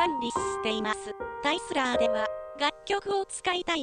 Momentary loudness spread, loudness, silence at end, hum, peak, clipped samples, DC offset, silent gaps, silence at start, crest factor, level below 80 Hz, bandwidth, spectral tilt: 6 LU; -29 LUFS; 0 s; none; -12 dBFS; under 0.1%; under 0.1%; none; 0 s; 18 dB; -58 dBFS; 10.5 kHz; -2.5 dB/octave